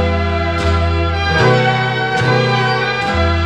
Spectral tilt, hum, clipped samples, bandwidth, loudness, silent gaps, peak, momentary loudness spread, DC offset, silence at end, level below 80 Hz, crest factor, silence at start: -6 dB/octave; none; under 0.1%; 9.4 kHz; -14 LUFS; none; 0 dBFS; 4 LU; 0.5%; 0 s; -26 dBFS; 14 dB; 0 s